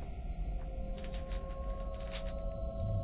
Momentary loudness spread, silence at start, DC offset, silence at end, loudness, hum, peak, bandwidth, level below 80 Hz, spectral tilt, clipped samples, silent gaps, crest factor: 3 LU; 0 s; under 0.1%; 0 s; -42 LUFS; none; -26 dBFS; 4 kHz; -40 dBFS; -7 dB/octave; under 0.1%; none; 12 dB